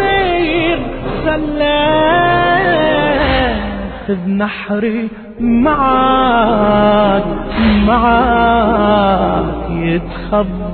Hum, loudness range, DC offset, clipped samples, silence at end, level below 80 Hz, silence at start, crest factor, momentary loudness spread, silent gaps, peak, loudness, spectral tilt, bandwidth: none; 3 LU; under 0.1%; under 0.1%; 0 s; -26 dBFS; 0 s; 12 dB; 8 LU; none; -2 dBFS; -13 LUFS; -9.5 dB/octave; 4.5 kHz